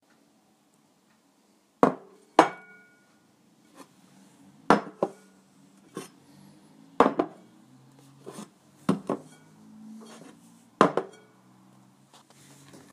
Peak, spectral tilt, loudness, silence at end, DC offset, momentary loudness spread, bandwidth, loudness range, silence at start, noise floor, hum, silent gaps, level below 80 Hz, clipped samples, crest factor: 0 dBFS; -5.5 dB/octave; -26 LUFS; 1.85 s; under 0.1%; 25 LU; 15.5 kHz; 3 LU; 1.85 s; -65 dBFS; none; none; -70 dBFS; under 0.1%; 32 dB